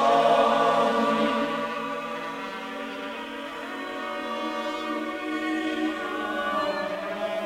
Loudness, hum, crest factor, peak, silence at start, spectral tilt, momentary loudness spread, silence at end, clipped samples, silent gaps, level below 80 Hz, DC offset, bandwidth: -27 LUFS; none; 18 dB; -10 dBFS; 0 s; -4.5 dB/octave; 13 LU; 0 s; under 0.1%; none; -62 dBFS; under 0.1%; 16 kHz